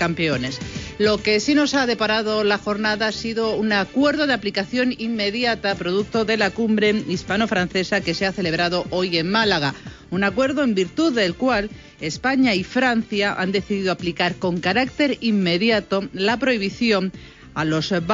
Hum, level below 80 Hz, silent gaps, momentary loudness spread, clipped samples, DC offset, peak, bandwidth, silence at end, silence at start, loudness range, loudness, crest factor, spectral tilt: none; -48 dBFS; none; 5 LU; under 0.1%; under 0.1%; -6 dBFS; 7.6 kHz; 0 s; 0 s; 1 LU; -20 LUFS; 16 dB; -5 dB/octave